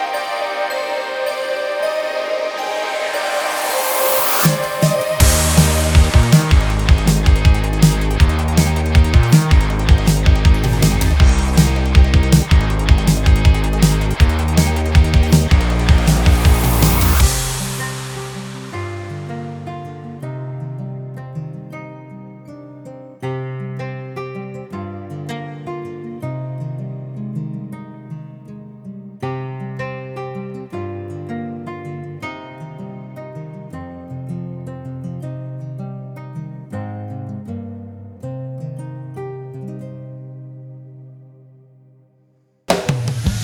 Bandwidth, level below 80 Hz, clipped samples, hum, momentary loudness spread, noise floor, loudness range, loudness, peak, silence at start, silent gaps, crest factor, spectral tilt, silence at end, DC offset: over 20 kHz; -20 dBFS; under 0.1%; none; 19 LU; -58 dBFS; 16 LU; -16 LUFS; 0 dBFS; 0 s; none; 16 dB; -5 dB/octave; 0 s; under 0.1%